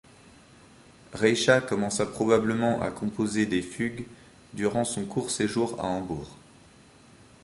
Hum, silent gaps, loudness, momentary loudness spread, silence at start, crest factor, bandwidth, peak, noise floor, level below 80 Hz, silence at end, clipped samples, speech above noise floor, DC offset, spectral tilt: none; none; -27 LUFS; 14 LU; 1.1 s; 22 dB; 11.5 kHz; -6 dBFS; -54 dBFS; -56 dBFS; 1.1 s; under 0.1%; 28 dB; under 0.1%; -4.5 dB/octave